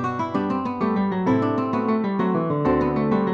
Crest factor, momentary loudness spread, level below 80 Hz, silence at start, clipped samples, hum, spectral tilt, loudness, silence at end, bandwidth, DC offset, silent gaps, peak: 14 dB; 3 LU; -48 dBFS; 0 s; under 0.1%; none; -9 dB/octave; -22 LUFS; 0 s; 7 kHz; under 0.1%; none; -8 dBFS